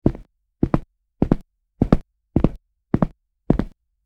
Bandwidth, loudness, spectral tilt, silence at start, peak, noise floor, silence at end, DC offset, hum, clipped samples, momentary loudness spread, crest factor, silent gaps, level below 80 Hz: 6.6 kHz; -23 LUFS; -10.5 dB/octave; 0.05 s; 0 dBFS; -43 dBFS; 0.4 s; under 0.1%; none; under 0.1%; 6 LU; 22 dB; none; -30 dBFS